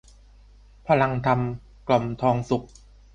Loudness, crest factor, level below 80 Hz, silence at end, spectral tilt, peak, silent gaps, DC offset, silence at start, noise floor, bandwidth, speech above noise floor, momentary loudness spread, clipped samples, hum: -24 LUFS; 20 dB; -48 dBFS; 0.5 s; -7.5 dB/octave; -6 dBFS; none; under 0.1%; 0.85 s; -51 dBFS; 9.2 kHz; 28 dB; 10 LU; under 0.1%; 50 Hz at -50 dBFS